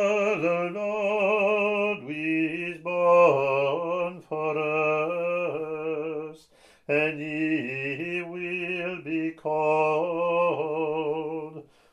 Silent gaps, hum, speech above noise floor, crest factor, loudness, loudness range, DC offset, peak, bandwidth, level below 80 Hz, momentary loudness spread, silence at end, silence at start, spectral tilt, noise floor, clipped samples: none; none; 33 dB; 18 dB; -26 LUFS; 5 LU; under 0.1%; -8 dBFS; 10 kHz; -72 dBFS; 9 LU; 0.3 s; 0 s; -6.5 dB/octave; -57 dBFS; under 0.1%